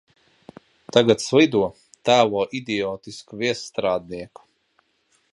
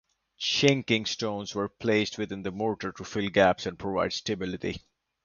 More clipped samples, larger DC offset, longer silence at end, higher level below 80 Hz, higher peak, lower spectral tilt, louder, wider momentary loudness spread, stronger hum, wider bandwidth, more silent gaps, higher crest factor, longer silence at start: neither; neither; first, 1.05 s vs 0.45 s; about the same, -60 dBFS vs -56 dBFS; first, 0 dBFS vs -6 dBFS; about the same, -4.5 dB/octave vs -4.5 dB/octave; first, -21 LUFS vs -28 LUFS; first, 18 LU vs 11 LU; neither; first, 11.5 kHz vs 7.4 kHz; neither; about the same, 22 dB vs 22 dB; first, 0.95 s vs 0.4 s